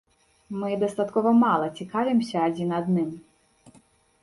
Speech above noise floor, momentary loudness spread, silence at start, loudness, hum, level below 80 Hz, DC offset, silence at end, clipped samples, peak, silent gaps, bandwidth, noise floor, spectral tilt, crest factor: 35 dB; 12 LU; 0.5 s; -24 LUFS; none; -66 dBFS; under 0.1%; 1 s; under 0.1%; -10 dBFS; none; 11.5 kHz; -59 dBFS; -7.5 dB/octave; 16 dB